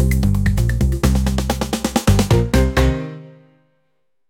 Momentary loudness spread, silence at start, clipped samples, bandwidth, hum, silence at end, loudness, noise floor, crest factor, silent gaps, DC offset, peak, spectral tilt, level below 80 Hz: 6 LU; 0 s; under 0.1%; 17 kHz; none; 1 s; -18 LUFS; -70 dBFS; 14 dB; none; under 0.1%; -4 dBFS; -6 dB/octave; -22 dBFS